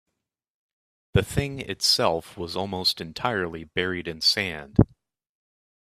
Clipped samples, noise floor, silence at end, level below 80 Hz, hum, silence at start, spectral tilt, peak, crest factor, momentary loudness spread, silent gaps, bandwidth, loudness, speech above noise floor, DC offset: under 0.1%; -82 dBFS; 1.15 s; -44 dBFS; none; 1.15 s; -4 dB/octave; -2 dBFS; 26 dB; 9 LU; none; 15.5 kHz; -25 LUFS; 57 dB; under 0.1%